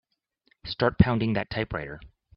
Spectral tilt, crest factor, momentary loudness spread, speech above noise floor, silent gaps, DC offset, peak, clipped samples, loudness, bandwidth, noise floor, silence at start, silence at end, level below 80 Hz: -10.5 dB/octave; 26 dB; 19 LU; 44 dB; none; under 0.1%; -2 dBFS; under 0.1%; -26 LUFS; 5.6 kHz; -69 dBFS; 0.65 s; 0.3 s; -44 dBFS